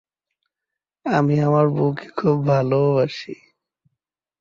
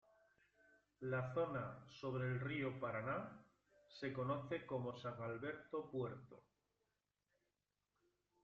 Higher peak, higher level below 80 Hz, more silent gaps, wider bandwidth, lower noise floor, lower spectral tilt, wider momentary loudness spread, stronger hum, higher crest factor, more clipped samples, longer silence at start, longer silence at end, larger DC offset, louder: first, -6 dBFS vs -30 dBFS; first, -60 dBFS vs -78 dBFS; neither; about the same, 7.2 kHz vs 7.2 kHz; second, -86 dBFS vs under -90 dBFS; first, -8.5 dB/octave vs -6 dB/octave; first, 15 LU vs 9 LU; second, none vs 50 Hz at -75 dBFS; about the same, 16 dB vs 18 dB; neither; about the same, 1.05 s vs 1 s; second, 1.05 s vs 2.05 s; neither; first, -19 LUFS vs -46 LUFS